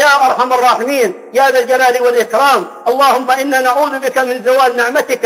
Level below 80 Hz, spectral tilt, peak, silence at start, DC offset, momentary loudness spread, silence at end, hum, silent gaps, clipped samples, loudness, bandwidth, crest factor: -64 dBFS; -2 dB/octave; 0 dBFS; 0 s; under 0.1%; 4 LU; 0 s; none; none; under 0.1%; -12 LUFS; 16.5 kHz; 10 dB